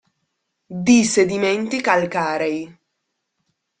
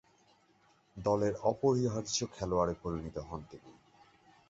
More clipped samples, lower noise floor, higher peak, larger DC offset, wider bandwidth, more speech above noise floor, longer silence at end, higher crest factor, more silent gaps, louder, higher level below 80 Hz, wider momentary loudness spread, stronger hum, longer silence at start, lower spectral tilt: neither; first, -76 dBFS vs -68 dBFS; first, -2 dBFS vs -16 dBFS; neither; first, 9.4 kHz vs 8 kHz; first, 58 dB vs 35 dB; first, 1.1 s vs 0.75 s; about the same, 18 dB vs 20 dB; neither; first, -18 LUFS vs -33 LUFS; about the same, -60 dBFS vs -56 dBFS; about the same, 14 LU vs 16 LU; neither; second, 0.7 s vs 0.95 s; second, -4 dB/octave vs -5.5 dB/octave